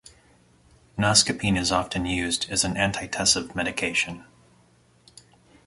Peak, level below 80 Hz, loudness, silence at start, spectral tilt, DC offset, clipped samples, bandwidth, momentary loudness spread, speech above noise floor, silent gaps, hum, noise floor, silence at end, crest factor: -2 dBFS; -48 dBFS; -23 LUFS; 0.95 s; -2.5 dB/octave; under 0.1%; under 0.1%; 11.5 kHz; 9 LU; 35 dB; none; none; -59 dBFS; 1.45 s; 24 dB